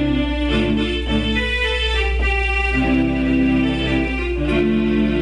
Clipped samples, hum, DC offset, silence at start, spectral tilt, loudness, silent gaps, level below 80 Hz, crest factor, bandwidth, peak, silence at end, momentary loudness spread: under 0.1%; none; under 0.1%; 0 s; -6.5 dB/octave; -18 LUFS; none; -24 dBFS; 10 dB; 10.5 kHz; -8 dBFS; 0 s; 3 LU